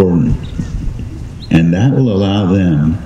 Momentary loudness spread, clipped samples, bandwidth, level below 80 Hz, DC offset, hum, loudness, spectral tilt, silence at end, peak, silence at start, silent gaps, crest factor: 13 LU; under 0.1%; 8 kHz; -26 dBFS; under 0.1%; none; -13 LUFS; -8.5 dB/octave; 0 s; 0 dBFS; 0 s; none; 12 dB